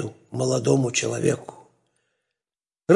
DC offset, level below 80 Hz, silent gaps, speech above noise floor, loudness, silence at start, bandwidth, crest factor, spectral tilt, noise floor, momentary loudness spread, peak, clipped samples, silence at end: under 0.1%; -66 dBFS; none; over 67 dB; -24 LUFS; 0 s; 11.5 kHz; 20 dB; -5 dB/octave; under -90 dBFS; 13 LU; -4 dBFS; under 0.1%; 0 s